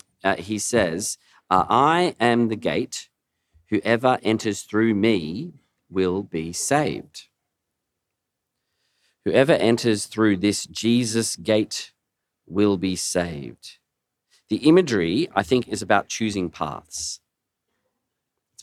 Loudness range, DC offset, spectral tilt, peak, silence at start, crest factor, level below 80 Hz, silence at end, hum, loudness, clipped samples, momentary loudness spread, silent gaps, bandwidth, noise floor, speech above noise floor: 5 LU; under 0.1%; -4.5 dB/octave; -2 dBFS; 0.25 s; 22 dB; -60 dBFS; 1.45 s; none; -22 LUFS; under 0.1%; 13 LU; none; 14.5 kHz; -81 dBFS; 60 dB